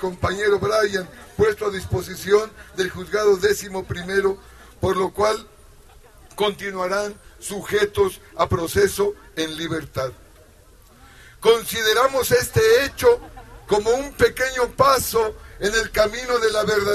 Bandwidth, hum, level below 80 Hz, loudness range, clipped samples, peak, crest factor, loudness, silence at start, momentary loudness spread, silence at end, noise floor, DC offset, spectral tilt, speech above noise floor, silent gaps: 13.5 kHz; none; -44 dBFS; 6 LU; under 0.1%; -2 dBFS; 20 dB; -21 LUFS; 0 s; 11 LU; 0 s; -49 dBFS; under 0.1%; -4 dB/octave; 29 dB; none